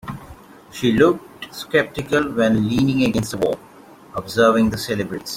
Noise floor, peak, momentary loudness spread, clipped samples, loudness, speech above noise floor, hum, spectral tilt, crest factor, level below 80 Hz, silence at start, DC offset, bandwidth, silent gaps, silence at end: -44 dBFS; -2 dBFS; 16 LU; under 0.1%; -19 LUFS; 25 dB; none; -5.5 dB/octave; 18 dB; -46 dBFS; 0.05 s; under 0.1%; 16.5 kHz; none; 0 s